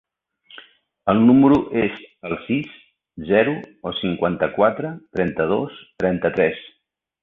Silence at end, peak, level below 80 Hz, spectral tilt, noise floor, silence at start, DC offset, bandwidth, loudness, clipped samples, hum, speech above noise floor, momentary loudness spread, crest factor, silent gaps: 0.6 s; -2 dBFS; -52 dBFS; -9 dB/octave; -71 dBFS; 1.05 s; under 0.1%; 4.1 kHz; -20 LUFS; under 0.1%; none; 51 dB; 15 LU; 18 dB; none